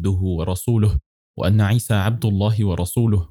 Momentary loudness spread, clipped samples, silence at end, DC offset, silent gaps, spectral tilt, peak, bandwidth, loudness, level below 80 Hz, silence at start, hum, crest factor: 5 LU; under 0.1%; 0.05 s; under 0.1%; 1.06-1.34 s; -7 dB/octave; -8 dBFS; 17 kHz; -20 LUFS; -36 dBFS; 0 s; none; 12 dB